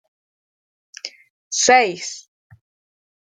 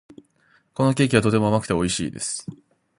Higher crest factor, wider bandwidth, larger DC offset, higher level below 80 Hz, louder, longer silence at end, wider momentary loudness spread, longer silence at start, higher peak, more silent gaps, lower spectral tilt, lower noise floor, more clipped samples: about the same, 22 dB vs 22 dB; second, 10 kHz vs 11.5 kHz; neither; second, -70 dBFS vs -48 dBFS; first, -16 LUFS vs -22 LUFS; first, 1 s vs 0.45 s; first, 21 LU vs 14 LU; first, 1.05 s vs 0.8 s; about the same, -2 dBFS vs -2 dBFS; first, 1.30-1.51 s vs none; second, -0.5 dB/octave vs -5 dB/octave; first, under -90 dBFS vs -62 dBFS; neither